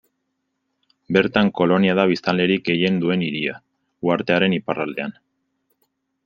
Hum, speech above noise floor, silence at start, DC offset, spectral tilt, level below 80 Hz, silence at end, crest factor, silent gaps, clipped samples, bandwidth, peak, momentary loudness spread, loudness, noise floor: none; 55 dB; 1.1 s; under 0.1%; -7.5 dB/octave; -60 dBFS; 1.15 s; 20 dB; none; under 0.1%; 6.8 kHz; -2 dBFS; 10 LU; -20 LUFS; -75 dBFS